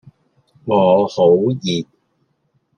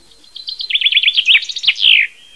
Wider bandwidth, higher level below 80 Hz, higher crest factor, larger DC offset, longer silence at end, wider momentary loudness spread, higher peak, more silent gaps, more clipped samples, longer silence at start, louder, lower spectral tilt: second, 8.8 kHz vs 11 kHz; about the same, -62 dBFS vs -62 dBFS; about the same, 16 dB vs 14 dB; second, under 0.1% vs 0.4%; first, 0.95 s vs 0.25 s; about the same, 15 LU vs 15 LU; about the same, -2 dBFS vs 0 dBFS; neither; neither; first, 0.65 s vs 0.4 s; second, -16 LUFS vs -10 LUFS; first, -6.5 dB/octave vs 4 dB/octave